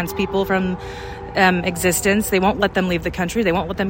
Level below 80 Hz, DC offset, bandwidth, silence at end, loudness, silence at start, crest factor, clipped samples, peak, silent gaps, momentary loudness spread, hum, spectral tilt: -38 dBFS; under 0.1%; 16.5 kHz; 0 s; -19 LUFS; 0 s; 18 dB; under 0.1%; -2 dBFS; none; 9 LU; none; -4.5 dB/octave